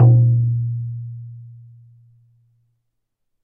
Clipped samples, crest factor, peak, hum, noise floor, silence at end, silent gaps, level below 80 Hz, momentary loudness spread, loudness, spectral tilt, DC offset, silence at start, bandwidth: under 0.1%; 18 dB; -2 dBFS; none; -73 dBFS; 1.95 s; none; -54 dBFS; 25 LU; -18 LUFS; -15.5 dB/octave; under 0.1%; 0 s; 1.2 kHz